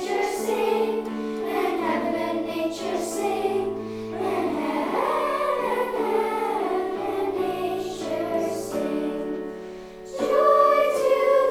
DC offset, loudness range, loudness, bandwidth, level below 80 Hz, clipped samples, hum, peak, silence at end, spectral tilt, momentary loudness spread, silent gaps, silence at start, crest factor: under 0.1%; 4 LU; -24 LUFS; 18.5 kHz; -56 dBFS; under 0.1%; none; -6 dBFS; 0 s; -4.5 dB/octave; 10 LU; none; 0 s; 18 dB